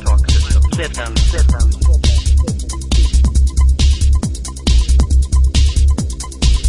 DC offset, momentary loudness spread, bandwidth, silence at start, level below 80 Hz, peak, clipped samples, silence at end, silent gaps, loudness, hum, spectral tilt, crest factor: 0.5%; 6 LU; 11.5 kHz; 0 s; -12 dBFS; -2 dBFS; under 0.1%; 0 s; none; -15 LUFS; none; -5 dB/octave; 10 dB